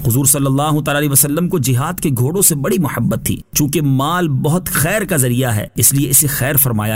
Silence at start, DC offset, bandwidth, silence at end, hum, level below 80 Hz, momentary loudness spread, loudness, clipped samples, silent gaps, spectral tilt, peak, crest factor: 0 s; 0.4%; 16.5 kHz; 0 s; none; -38 dBFS; 6 LU; -14 LUFS; under 0.1%; none; -4.5 dB/octave; 0 dBFS; 14 dB